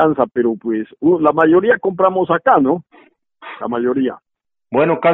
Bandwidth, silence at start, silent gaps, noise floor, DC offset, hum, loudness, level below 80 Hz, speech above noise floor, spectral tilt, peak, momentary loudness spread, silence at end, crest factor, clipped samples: 4.1 kHz; 0 s; none; -50 dBFS; under 0.1%; none; -16 LUFS; -58 dBFS; 36 dB; -5.5 dB/octave; 0 dBFS; 10 LU; 0 s; 16 dB; under 0.1%